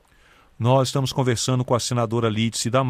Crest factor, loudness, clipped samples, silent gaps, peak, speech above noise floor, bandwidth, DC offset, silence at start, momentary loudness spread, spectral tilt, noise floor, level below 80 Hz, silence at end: 14 dB; -22 LUFS; under 0.1%; none; -8 dBFS; 34 dB; 15.5 kHz; under 0.1%; 0.6 s; 3 LU; -5 dB/octave; -55 dBFS; -54 dBFS; 0 s